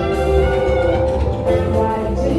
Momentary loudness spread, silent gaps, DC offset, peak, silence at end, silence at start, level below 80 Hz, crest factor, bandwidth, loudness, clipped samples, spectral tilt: 3 LU; none; under 0.1%; -4 dBFS; 0 s; 0 s; -24 dBFS; 12 dB; 12 kHz; -17 LUFS; under 0.1%; -7.5 dB/octave